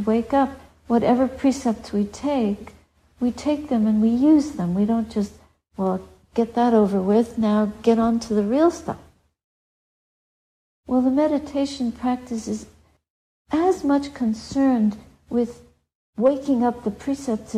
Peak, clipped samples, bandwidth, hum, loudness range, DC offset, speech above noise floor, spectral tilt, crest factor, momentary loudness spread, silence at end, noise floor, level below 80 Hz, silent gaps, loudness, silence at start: -6 dBFS; under 0.1%; 11 kHz; none; 5 LU; under 0.1%; over 69 dB; -7 dB/octave; 16 dB; 10 LU; 0 s; under -90 dBFS; -52 dBFS; 9.44-10.83 s, 13.10-13.45 s, 15.95-16.13 s; -22 LUFS; 0 s